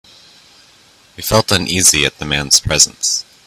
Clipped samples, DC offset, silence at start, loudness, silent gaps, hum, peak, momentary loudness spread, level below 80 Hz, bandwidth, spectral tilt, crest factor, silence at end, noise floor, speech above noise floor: 0.1%; under 0.1%; 1.2 s; -12 LUFS; none; none; 0 dBFS; 7 LU; -38 dBFS; over 20 kHz; -1.5 dB/octave; 16 dB; 0.25 s; -48 dBFS; 33 dB